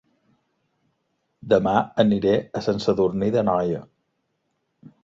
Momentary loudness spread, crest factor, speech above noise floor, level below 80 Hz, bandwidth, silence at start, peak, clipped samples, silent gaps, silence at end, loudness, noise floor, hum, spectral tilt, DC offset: 6 LU; 22 dB; 53 dB; -54 dBFS; 7.6 kHz; 1.45 s; -2 dBFS; under 0.1%; none; 1.2 s; -22 LUFS; -74 dBFS; none; -7.5 dB/octave; under 0.1%